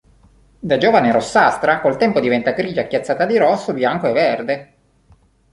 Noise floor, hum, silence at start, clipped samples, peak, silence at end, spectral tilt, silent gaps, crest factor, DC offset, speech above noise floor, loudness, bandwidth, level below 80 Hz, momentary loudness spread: -53 dBFS; none; 0.65 s; under 0.1%; -2 dBFS; 0.9 s; -5.5 dB/octave; none; 16 dB; under 0.1%; 37 dB; -16 LUFS; 11.5 kHz; -54 dBFS; 7 LU